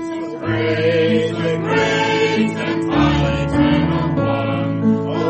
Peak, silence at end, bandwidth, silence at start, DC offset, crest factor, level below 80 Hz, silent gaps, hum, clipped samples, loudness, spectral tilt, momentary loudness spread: -4 dBFS; 0 s; 8.6 kHz; 0 s; under 0.1%; 14 dB; -36 dBFS; none; none; under 0.1%; -17 LUFS; -6.5 dB/octave; 5 LU